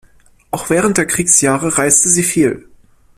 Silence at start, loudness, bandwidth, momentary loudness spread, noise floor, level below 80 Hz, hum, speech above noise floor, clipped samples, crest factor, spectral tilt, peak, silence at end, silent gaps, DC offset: 0.55 s; -12 LUFS; 16 kHz; 13 LU; -47 dBFS; -46 dBFS; none; 34 dB; under 0.1%; 16 dB; -3.5 dB/octave; 0 dBFS; 0.6 s; none; under 0.1%